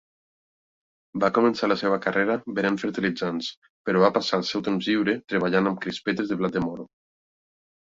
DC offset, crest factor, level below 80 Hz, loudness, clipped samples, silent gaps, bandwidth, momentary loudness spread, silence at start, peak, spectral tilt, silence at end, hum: under 0.1%; 20 dB; -62 dBFS; -24 LUFS; under 0.1%; 3.57-3.62 s, 3.69-3.85 s; 7.8 kHz; 8 LU; 1.15 s; -6 dBFS; -6 dB/octave; 0.95 s; none